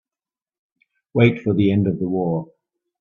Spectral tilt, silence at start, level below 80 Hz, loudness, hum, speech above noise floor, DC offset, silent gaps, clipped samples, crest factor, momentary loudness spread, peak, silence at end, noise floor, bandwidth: -10 dB/octave; 1.15 s; -56 dBFS; -20 LUFS; none; over 72 dB; under 0.1%; none; under 0.1%; 20 dB; 8 LU; 0 dBFS; 0.55 s; under -90 dBFS; 4.1 kHz